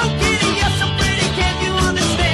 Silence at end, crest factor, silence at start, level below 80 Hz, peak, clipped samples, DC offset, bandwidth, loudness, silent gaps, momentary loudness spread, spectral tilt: 0 s; 14 dB; 0 s; -26 dBFS; -4 dBFS; under 0.1%; under 0.1%; 13.5 kHz; -16 LUFS; none; 2 LU; -4 dB/octave